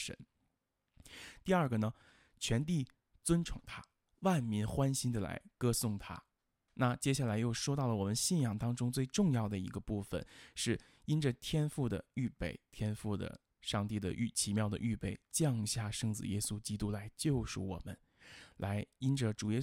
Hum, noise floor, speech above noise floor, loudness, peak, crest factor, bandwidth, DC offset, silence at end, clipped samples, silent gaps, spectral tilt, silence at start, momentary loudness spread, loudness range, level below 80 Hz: none; -84 dBFS; 48 dB; -37 LUFS; -18 dBFS; 18 dB; 16.5 kHz; under 0.1%; 0 s; under 0.1%; none; -5 dB/octave; 0 s; 13 LU; 3 LU; -56 dBFS